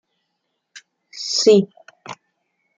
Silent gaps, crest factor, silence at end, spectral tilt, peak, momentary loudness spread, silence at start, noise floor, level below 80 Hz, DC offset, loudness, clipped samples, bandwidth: none; 20 dB; 0.65 s; -4 dB/octave; -2 dBFS; 26 LU; 1.15 s; -75 dBFS; -72 dBFS; under 0.1%; -16 LUFS; under 0.1%; 9.2 kHz